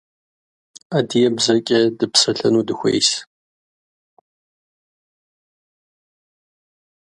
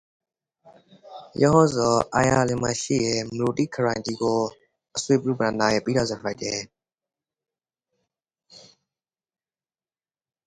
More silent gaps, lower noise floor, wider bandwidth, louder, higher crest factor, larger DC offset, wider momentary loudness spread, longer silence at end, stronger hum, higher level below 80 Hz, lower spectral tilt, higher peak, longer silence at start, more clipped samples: neither; about the same, under -90 dBFS vs under -90 dBFS; about the same, 11.5 kHz vs 11 kHz; first, -17 LUFS vs -23 LUFS; about the same, 22 dB vs 22 dB; neither; second, 6 LU vs 12 LU; first, 3.95 s vs 1.85 s; neither; second, -64 dBFS vs -54 dBFS; second, -3.5 dB/octave vs -5 dB/octave; first, 0 dBFS vs -4 dBFS; second, 0.9 s vs 1.05 s; neither